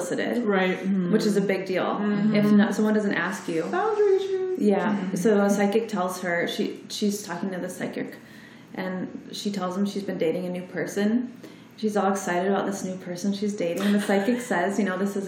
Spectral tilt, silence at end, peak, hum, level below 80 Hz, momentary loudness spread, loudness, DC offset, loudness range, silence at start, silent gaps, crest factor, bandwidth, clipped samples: -5.5 dB/octave; 0 s; -10 dBFS; none; -76 dBFS; 10 LU; -25 LUFS; under 0.1%; 7 LU; 0 s; none; 16 dB; 16 kHz; under 0.1%